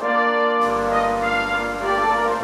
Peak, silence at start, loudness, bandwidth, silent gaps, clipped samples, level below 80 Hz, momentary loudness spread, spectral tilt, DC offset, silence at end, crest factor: -8 dBFS; 0 s; -20 LUFS; 15 kHz; none; under 0.1%; -44 dBFS; 3 LU; -4 dB/octave; under 0.1%; 0 s; 12 dB